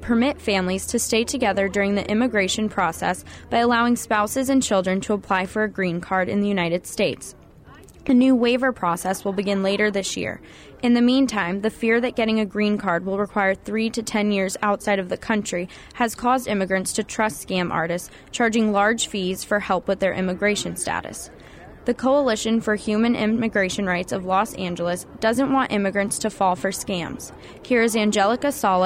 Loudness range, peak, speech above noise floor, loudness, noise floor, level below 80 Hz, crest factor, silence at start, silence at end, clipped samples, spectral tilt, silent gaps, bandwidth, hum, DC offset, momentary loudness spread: 2 LU; -8 dBFS; 24 dB; -22 LUFS; -46 dBFS; -50 dBFS; 14 dB; 0 s; 0 s; under 0.1%; -4.5 dB/octave; none; 16 kHz; none; under 0.1%; 7 LU